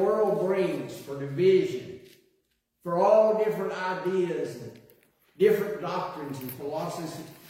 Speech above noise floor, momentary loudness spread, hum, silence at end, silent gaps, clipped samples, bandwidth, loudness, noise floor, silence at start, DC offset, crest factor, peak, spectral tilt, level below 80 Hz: 46 dB; 16 LU; none; 0 s; none; under 0.1%; 16.5 kHz; -27 LUFS; -74 dBFS; 0 s; under 0.1%; 18 dB; -8 dBFS; -6.5 dB/octave; -70 dBFS